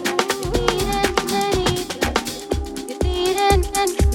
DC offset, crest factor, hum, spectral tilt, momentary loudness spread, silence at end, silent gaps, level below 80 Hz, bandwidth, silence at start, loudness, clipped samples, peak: under 0.1%; 20 dB; none; -4 dB/octave; 8 LU; 0 s; none; -28 dBFS; 18 kHz; 0 s; -20 LUFS; under 0.1%; 0 dBFS